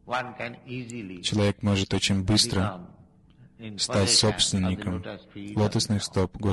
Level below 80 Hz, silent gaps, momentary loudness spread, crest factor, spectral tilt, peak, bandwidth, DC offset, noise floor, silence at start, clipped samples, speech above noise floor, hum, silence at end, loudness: -44 dBFS; none; 17 LU; 20 dB; -4 dB/octave; -6 dBFS; 12 kHz; under 0.1%; -55 dBFS; 0.05 s; under 0.1%; 29 dB; none; 0 s; -25 LUFS